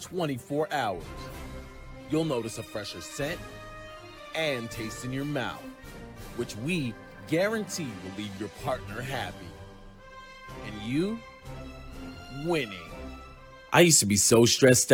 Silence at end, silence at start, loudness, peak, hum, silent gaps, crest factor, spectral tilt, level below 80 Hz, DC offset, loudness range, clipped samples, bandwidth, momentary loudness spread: 0 s; 0 s; -27 LUFS; -6 dBFS; none; none; 24 dB; -3.5 dB/octave; -50 dBFS; under 0.1%; 10 LU; under 0.1%; 17.5 kHz; 25 LU